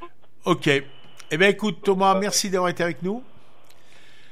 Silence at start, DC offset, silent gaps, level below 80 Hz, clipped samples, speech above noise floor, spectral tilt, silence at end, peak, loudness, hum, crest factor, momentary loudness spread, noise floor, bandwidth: 0 s; 1%; none; -68 dBFS; under 0.1%; 34 dB; -4 dB/octave; 1.1 s; -4 dBFS; -22 LUFS; none; 20 dB; 11 LU; -55 dBFS; 15.5 kHz